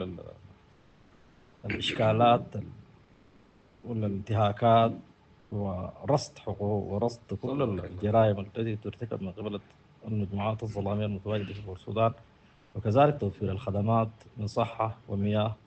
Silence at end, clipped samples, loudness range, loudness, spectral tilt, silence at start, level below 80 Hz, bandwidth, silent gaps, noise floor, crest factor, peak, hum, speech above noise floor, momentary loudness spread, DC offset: 0.15 s; under 0.1%; 4 LU; -29 LUFS; -7.5 dB/octave; 0 s; -60 dBFS; 8.4 kHz; none; -59 dBFS; 20 dB; -8 dBFS; none; 31 dB; 16 LU; under 0.1%